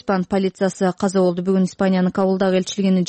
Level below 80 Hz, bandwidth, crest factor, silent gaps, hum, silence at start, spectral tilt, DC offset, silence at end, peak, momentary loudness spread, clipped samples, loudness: -54 dBFS; 8.8 kHz; 12 dB; none; none; 0.05 s; -6.5 dB/octave; under 0.1%; 0 s; -8 dBFS; 2 LU; under 0.1%; -19 LUFS